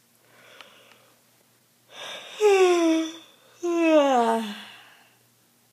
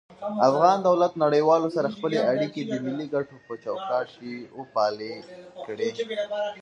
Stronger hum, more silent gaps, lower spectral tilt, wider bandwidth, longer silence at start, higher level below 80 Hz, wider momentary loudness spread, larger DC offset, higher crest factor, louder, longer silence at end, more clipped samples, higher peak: neither; neither; second, -3.5 dB/octave vs -6 dB/octave; first, 15.5 kHz vs 9.6 kHz; first, 1.95 s vs 0.1 s; second, under -90 dBFS vs -72 dBFS; first, 21 LU vs 17 LU; neither; about the same, 18 dB vs 20 dB; first, -22 LUFS vs -25 LUFS; first, 1.05 s vs 0 s; neither; about the same, -8 dBFS vs -6 dBFS